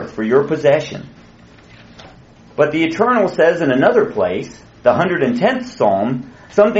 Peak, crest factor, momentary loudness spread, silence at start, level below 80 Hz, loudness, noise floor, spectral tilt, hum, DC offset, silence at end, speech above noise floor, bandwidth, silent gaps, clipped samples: 0 dBFS; 16 dB; 12 LU; 0 s; -52 dBFS; -16 LUFS; -43 dBFS; -5 dB/octave; none; under 0.1%; 0 s; 28 dB; 8 kHz; none; under 0.1%